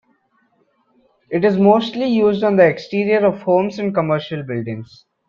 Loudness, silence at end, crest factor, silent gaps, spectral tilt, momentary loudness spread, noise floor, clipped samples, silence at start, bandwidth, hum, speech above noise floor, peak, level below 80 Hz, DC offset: -17 LUFS; 0.45 s; 16 dB; none; -8 dB/octave; 11 LU; -62 dBFS; under 0.1%; 1.3 s; 7 kHz; none; 45 dB; -2 dBFS; -60 dBFS; under 0.1%